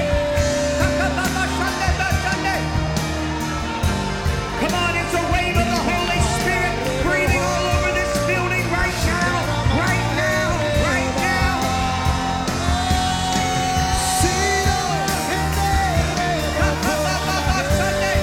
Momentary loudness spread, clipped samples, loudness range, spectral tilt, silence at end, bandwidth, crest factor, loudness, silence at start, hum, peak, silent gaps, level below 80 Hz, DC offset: 3 LU; under 0.1%; 2 LU; -4.5 dB/octave; 0 s; 17.5 kHz; 16 dB; -20 LUFS; 0 s; none; -4 dBFS; none; -28 dBFS; under 0.1%